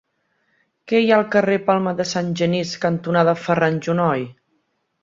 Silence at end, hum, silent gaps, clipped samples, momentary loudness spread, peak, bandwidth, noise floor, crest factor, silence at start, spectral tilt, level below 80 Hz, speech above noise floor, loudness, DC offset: 0.7 s; none; none; under 0.1%; 6 LU; -2 dBFS; 7.6 kHz; -69 dBFS; 18 dB; 0.85 s; -6 dB/octave; -62 dBFS; 50 dB; -19 LUFS; under 0.1%